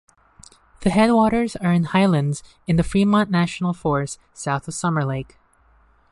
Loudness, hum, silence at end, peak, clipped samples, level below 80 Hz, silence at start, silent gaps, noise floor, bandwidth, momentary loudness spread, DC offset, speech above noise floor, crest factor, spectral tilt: -20 LUFS; none; 0.9 s; -4 dBFS; under 0.1%; -44 dBFS; 0.8 s; none; -57 dBFS; 11.5 kHz; 11 LU; under 0.1%; 37 dB; 16 dB; -6.5 dB/octave